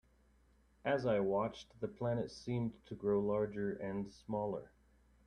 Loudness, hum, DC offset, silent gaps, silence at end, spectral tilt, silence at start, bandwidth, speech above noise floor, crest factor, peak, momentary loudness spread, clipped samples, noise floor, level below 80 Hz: -39 LUFS; none; under 0.1%; none; 0.6 s; -7.5 dB/octave; 0.85 s; 9.8 kHz; 32 dB; 16 dB; -22 dBFS; 10 LU; under 0.1%; -70 dBFS; -66 dBFS